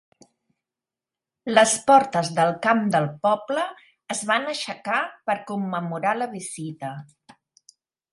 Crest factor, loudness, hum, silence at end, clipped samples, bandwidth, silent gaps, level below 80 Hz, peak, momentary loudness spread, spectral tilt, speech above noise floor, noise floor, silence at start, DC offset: 22 dB; -23 LUFS; none; 1.1 s; under 0.1%; 11.5 kHz; none; -70 dBFS; -2 dBFS; 15 LU; -4 dB/octave; 67 dB; -89 dBFS; 1.45 s; under 0.1%